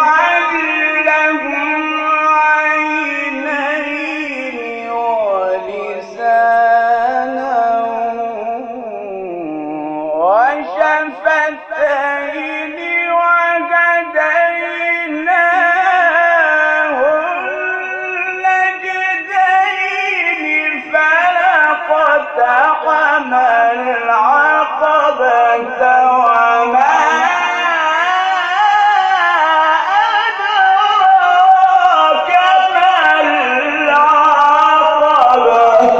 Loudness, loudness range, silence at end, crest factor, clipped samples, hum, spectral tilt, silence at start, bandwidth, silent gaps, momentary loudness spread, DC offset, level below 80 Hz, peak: -12 LUFS; 6 LU; 0 s; 12 dB; under 0.1%; none; -2.5 dB/octave; 0 s; 8 kHz; none; 10 LU; under 0.1%; -58 dBFS; 0 dBFS